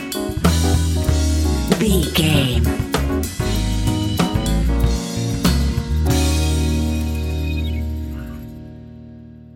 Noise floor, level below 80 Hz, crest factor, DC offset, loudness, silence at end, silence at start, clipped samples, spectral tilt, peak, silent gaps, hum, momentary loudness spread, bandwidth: -39 dBFS; -22 dBFS; 18 dB; under 0.1%; -19 LUFS; 0 s; 0 s; under 0.1%; -5.5 dB/octave; 0 dBFS; none; none; 14 LU; 17 kHz